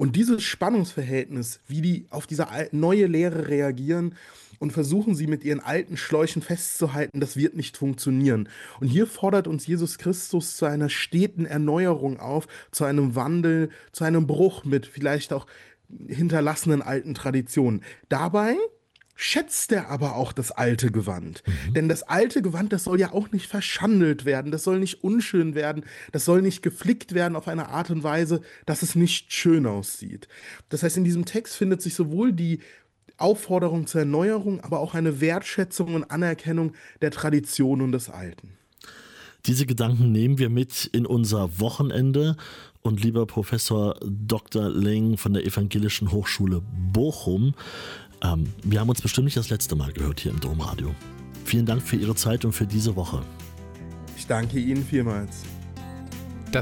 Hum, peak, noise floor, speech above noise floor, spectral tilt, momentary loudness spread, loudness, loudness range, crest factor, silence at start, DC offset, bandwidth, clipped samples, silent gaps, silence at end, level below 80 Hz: none; -10 dBFS; -48 dBFS; 24 dB; -5.5 dB/octave; 10 LU; -24 LUFS; 2 LU; 14 dB; 0 s; under 0.1%; 17 kHz; under 0.1%; none; 0 s; -46 dBFS